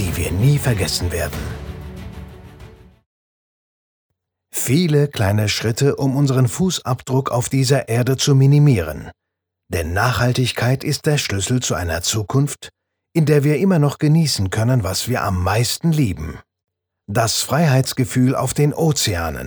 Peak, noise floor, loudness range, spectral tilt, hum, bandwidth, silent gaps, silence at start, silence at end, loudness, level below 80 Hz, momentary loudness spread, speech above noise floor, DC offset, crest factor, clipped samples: -2 dBFS; -79 dBFS; 6 LU; -5 dB/octave; none; over 20 kHz; 3.06-4.10 s; 0 s; 0 s; -18 LUFS; -38 dBFS; 10 LU; 62 dB; under 0.1%; 16 dB; under 0.1%